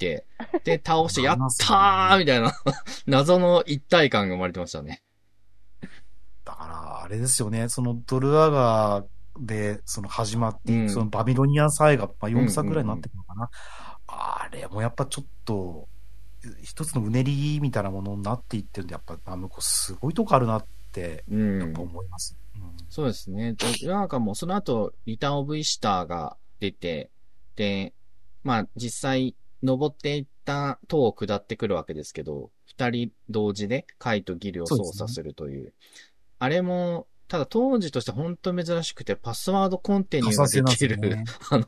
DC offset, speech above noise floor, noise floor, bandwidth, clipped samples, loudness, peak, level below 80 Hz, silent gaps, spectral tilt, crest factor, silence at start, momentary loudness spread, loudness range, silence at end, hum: 1%; 29 dB; -54 dBFS; 13.5 kHz; under 0.1%; -25 LUFS; -2 dBFS; -52 dBFS; none; -5 dB/octave; 22 dB; 0 s; 17 LU; 9 LU; 0 s; none